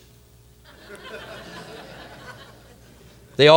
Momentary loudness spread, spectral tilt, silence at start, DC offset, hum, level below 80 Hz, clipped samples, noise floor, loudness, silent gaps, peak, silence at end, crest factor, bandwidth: 13 LU; -5 dB/octave; 1.15 s; under 0.1%; none; -56 dBFS; under 0.1%; -51 dBFS; -29 LUFS; none; 0 dBFS; 0 s; 24 dB; 16.5 kHz